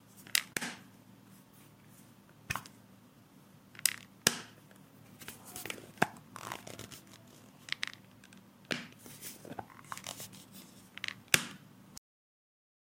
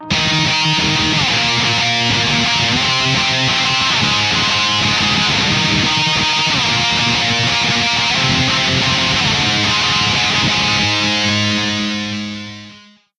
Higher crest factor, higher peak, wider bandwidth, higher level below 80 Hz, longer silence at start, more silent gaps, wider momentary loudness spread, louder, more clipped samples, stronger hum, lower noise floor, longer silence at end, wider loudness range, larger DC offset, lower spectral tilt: first, 40 dB vs 14 dB; about the same, -2 dBFS vs -2 dBFS; first, 16.5 kHz vs 10.5 kHz; second, -72 dBFS vs -40 dBFS; about the same, 0.05 s vs 0 s; neither; first, 26 LU vs 2 LU; second, -37 LUFS vs -13 LUFS; neither; neither; first, -60 dBFS vs -43 dBFS; first, 1 s vs 0.4 s; first, 8 LU vs 1 LU; neither; about the same, -1.5 dB/octave vs -2.5 dB/octave